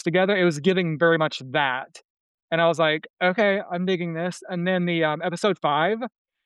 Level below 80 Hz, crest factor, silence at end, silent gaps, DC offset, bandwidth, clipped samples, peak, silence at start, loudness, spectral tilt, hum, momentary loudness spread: -76 dBFS; 16 dB; 0.4 s; 2.04-2.48 s, 3.10-3.14 s; under 0.1%; 11.5 kHz; under 0.1%; -8 dBFS; 0.05 s; -23 LUFS; -6 dB/octave; none; 8 LU